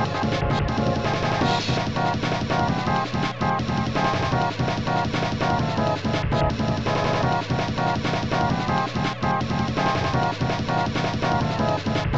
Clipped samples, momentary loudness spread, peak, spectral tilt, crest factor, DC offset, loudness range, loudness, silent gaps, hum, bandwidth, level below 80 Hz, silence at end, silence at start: under 0.1%; 2 LU; -10 dBFS; -6 dB/octave; 14 dB; 0.6%; 0 LU; -23 LUFS; none; none; 8.2 kHz; -40 dBFS; 0 s; 0 s